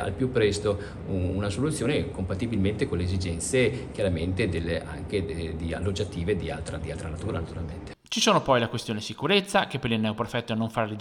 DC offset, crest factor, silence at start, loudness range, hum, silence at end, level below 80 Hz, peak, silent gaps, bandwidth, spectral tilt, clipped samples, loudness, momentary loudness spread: under 0.1%; 20 dB; 0 s; 5 LU; none; 0 s; -46 dBFS; -8 dBFS; none; 14.5 kHz; -5 dB/octave; under 0.1%; -27 LUFS; 10 LU